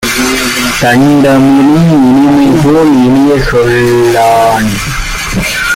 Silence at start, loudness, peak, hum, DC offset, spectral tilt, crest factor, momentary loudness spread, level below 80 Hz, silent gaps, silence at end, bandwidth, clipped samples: 0 s; -7 LUFS; 0 dBFS; none; under 0.1%; -5 dB/octave; 6 dB; 7 LU; -26 dBFS; none; 0 s; 16.5 kHz; under 0.1%